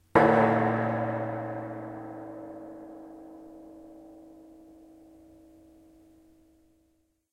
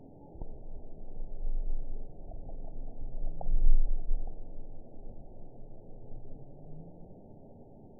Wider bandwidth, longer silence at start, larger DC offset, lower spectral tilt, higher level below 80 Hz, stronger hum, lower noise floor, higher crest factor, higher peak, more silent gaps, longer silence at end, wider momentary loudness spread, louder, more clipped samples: first, 11.5 kHz vs 0.9 kHz; about the same, 0.15 s vs 0.25 s; second, under 0.1% vs 0.2%; second, -8.5 dB/octave vs -14.5 dB/octave; second, -62 dBFS vs -32 dBFS; neither; first, -71 dBFS vs -53 dBFS; first, 26 dB vs 18 dB; first, -6 dBFS vs -10 dBFS; neither; first, 3 s vs 0.15 s; first, 28 LU vs 19 LU; first, -27 LUFS vs -42 LUFS; neither